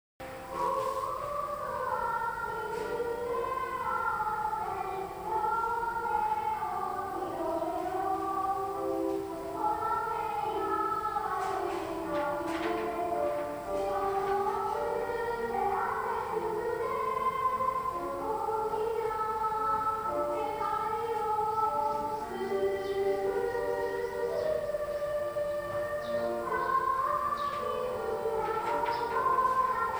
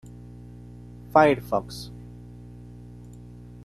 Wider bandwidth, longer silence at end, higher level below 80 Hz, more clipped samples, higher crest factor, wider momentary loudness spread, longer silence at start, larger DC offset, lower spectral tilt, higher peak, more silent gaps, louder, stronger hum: first, over 20 kHz vs 13 kHz; second, 0 s vs 1.65 s; second, -58 dBFS vs -50 dBFS; neither; second, 14 dB vs 24 dB; second, 5 LU vs 25 LU; second, 0.2 s vs 1.15 s; neither; second, -5 dB/octave vs -6.5 dB/octave; second, -16 dBFS vs -4 dBFS; neither; second, -32 LUFS vs -22 LUFS; second, none vs 60 Hz at -40 dBFS